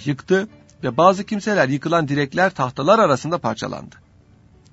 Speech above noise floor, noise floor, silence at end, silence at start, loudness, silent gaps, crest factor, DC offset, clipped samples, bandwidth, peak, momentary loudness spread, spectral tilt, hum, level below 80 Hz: 32 dB; -51 dBFS; 0.85 s; 0 s; -19 LUFS; none; 20 dB; under 0.1%; under 0.1%; 8 kHz; 0 dBFS; 13 LU; -6 dB/octave; none; -56 dBFS